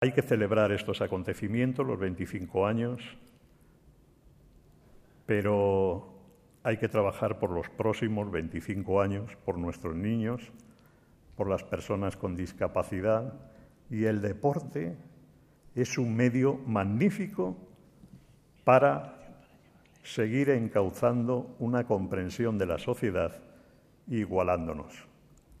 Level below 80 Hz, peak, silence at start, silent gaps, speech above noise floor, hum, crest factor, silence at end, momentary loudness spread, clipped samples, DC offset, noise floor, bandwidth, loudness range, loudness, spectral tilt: -60 dBFS; -8 dBFS; 0 s; none; 31 dB; none; 24 dB; 0.55 s; 12 LU; under 0.1%; under 0.1%; -60 dBFS; 15 kHz; 5 LU; -30 LUFS; -7 dB/octave